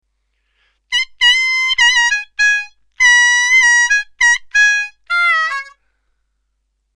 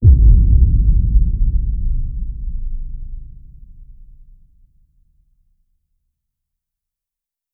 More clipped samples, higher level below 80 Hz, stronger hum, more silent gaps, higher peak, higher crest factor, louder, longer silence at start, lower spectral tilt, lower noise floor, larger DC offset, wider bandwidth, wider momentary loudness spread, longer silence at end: neither; second, -52 dBFS vs -16 dBFS; neither; neither; about the same, -2 dBFS vs 0 dBFS; about the same, 14 dB vs 16 dB; first, -11 LUFS vs -17 LUFS; first, 0.9 s vs 0 s; second, 6 dB/octave vs -15.5 dB/octave; second, -68 dBFS vs -87 dBFS; neither; first, 12.5 kHz vs 0.6 kHz; second, 10 LU vs 22 LU; second, 1.3 s vs 3.7 s